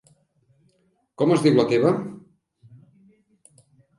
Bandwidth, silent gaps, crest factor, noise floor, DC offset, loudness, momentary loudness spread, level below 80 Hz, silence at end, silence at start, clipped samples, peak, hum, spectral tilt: 11.5 kHz; none; 20 dB; -67 dBFS; under 0.1%; -20 LUFS; 10 LU; -68 dBFS; 1.8 s; 1.2 s; under 0.1%; -6 dBFS; none; -7 dB/octave